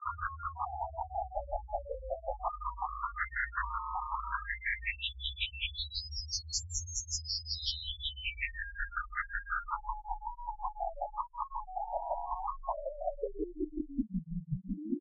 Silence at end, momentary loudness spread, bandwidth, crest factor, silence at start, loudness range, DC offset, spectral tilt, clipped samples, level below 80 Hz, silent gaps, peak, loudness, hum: 0 s; 5 LU; 6.6 kHz; 18 dB; 0 s; 3 LU; under 0.1%; -2 dB/octave; under 0.1%; -46 dBFS; none; -20 dBFS; -37 LUFS; none